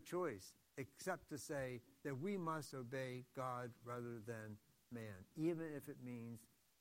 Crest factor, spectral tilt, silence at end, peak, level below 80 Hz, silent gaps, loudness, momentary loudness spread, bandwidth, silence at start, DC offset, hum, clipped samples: 18 dB; -6 dB/octave; 0.35 s; -30 dBFS; -80 dBFS; none; -49 LUFS; 11 LU; 16 kHz; 0 s; under 0.1%; none; under 0.1%